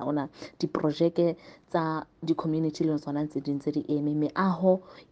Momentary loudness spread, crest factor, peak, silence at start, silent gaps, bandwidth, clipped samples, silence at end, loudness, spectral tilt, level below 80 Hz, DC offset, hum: 7 LU; 18 dB; -10 dBFS; 0 s; none; 7.8 kHz; under 0.1%; 0.1 s; -29 LUFS; -8 dB/octave; -66 dBFS; under 0.1%; none